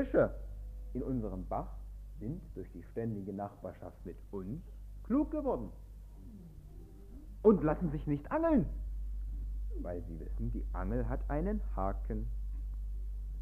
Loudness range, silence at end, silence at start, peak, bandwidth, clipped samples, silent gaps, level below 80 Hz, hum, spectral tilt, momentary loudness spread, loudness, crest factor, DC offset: 8 LU; 0 s; 0 s; -12 dBFS; 3.6 kHz; under 0.1%; none; -42 dBFS; none; -10.5 dB/octave; 22 LU; -37 LUFS; 24 dB; under 0.1%